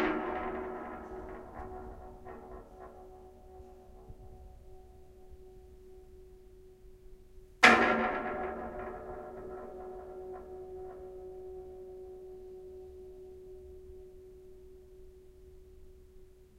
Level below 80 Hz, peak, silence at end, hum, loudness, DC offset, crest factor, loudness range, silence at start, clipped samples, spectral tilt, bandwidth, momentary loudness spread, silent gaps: -56 dBFS; -6 dBFS; 0 s; none; -32 LUFS; under 0.1%; 32 dB; 25 LU; 0 s; under 0.1%; -3.5 dB/octave; 16 kHz; 23 LU; none